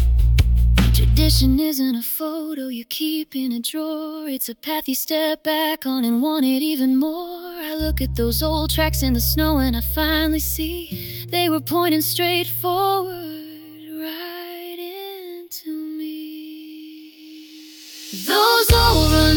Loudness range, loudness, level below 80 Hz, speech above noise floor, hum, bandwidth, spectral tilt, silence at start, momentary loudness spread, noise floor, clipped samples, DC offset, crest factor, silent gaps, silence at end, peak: 12 LU; -20 LUFS; -26 dBFS; 20 dB; none; 19 kHz; -5 dB/octave; 0 s; 19 LU; -41 dBFS; under 0.1%; under 0.1%; 16 dB; none; 0 s; -4 dBFS